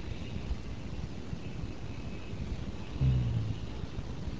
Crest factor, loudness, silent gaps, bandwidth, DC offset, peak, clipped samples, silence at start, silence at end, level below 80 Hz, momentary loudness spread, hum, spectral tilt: 18 dB; -37 LUFS; none; 8 kHz; 0.8%; -18 dBFS; under 0.1%; 0 s; 0 s; -42 dBFS; 11 LU; none; -7.5 dB/octave